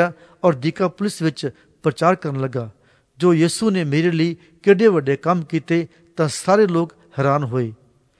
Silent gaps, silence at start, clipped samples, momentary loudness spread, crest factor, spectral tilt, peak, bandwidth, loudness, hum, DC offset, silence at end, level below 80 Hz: none; 0 s; under 0.1%; 10 LU; 18 dB; -6.5 dB/octave; 0 dBFS; 11 kHz; -19 LUFS; none; under 0.1%; 0.45 s; -62 dBFS